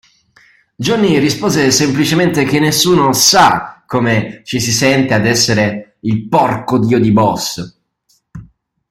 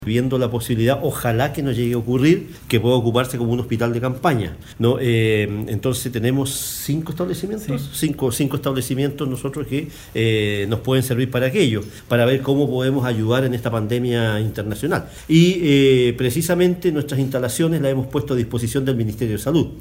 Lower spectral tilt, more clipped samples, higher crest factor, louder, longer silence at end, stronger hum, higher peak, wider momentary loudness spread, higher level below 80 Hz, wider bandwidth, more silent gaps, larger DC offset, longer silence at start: second, -4 dB/octave vs -6 dB/octave; neither; about the same, 14 dB vs 18 dB; first, -12 LUFS vs -20 LUFS; first, 0.45 s vs 0 s; neither; about the same, 0 dBFS vs -2 dBFS; first, 10 LU vs 7 LU; about the same, -46 dBFS vs -44 dBFS; about the same, 16.5 kHz vs 16 kHz; neither; neither; first, 0.8 s vs 0 s